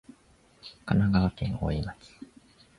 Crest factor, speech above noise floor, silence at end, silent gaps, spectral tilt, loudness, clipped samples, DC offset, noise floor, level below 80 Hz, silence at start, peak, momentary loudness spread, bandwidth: 18 dB; 33 dB; 0.55 s; none; -8.5 dB/octave; -28 LUFS; under 0.1%; under 0.1%; -61 dBFS; -44 dBFS; 0.65 s; -12 dBFS; 25 LU; 11 kHz